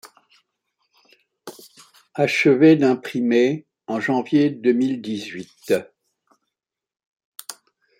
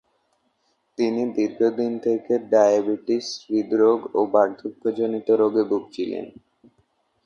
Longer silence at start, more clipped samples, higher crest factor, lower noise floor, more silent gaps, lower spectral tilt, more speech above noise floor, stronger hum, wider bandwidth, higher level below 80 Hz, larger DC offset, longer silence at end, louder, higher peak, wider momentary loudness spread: second, 0.05 s vs 1 s; neither; about the same, 18 dB vs 18 dB; first, -85 dBFS vs -69 dBFS; first, 7.06-7.16 s, 7.25-7.32 s vs none; about the same, -6 dB/octave vs -5.5 dB/octave; first, 66 dB vs 48 dB; neither; first, 16.5 kHz vs 7.2 kHz; about the same, -70 dBFS vs -70 dBFS; neither; second, 0.5 s vs 0.95 s; first, -19 LUFS vs -22 LUFS; about the same, -4 dBFS vs -4 dBFS; first, 23 LU vs 10 LU